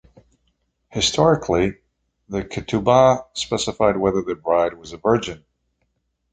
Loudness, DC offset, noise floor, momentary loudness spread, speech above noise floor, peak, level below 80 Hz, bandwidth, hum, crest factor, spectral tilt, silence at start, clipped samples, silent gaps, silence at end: -20 LUFS; under 0.1%; -71 dBFS; 13 LU; 52 dB; -2 dBFS; -46 dBFS; 9.4 kHz; none; 20 dB; -4.5 dB/octave; 0.95 s; under 0.1%; none; 0.95 s